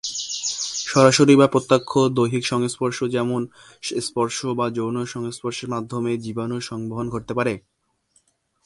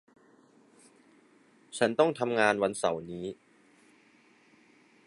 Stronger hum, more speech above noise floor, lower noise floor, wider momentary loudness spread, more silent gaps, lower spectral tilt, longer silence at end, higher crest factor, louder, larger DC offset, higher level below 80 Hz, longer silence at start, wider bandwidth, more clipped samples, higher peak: neither; first, 44 dB vs 34 dB; about the same, -64 dBFS vs -62 dBFS; second, 13 LU vs 16 LU; neither; about the same, -4.5 dB/octave vs -4.5 dB/octave; second, 1.05 s vs 1.75 s; about the same, 22 dB vs 24 dB; first, -21 LUFS vs -29 LUFS; neither; first, -58 dBFS vs -72 dBFS; second, 0.05 s vs 1.75 s; about the same, 11.5 kHz vs 11.5 kHz; neither; first, 0 dBFS vs -8 dBFS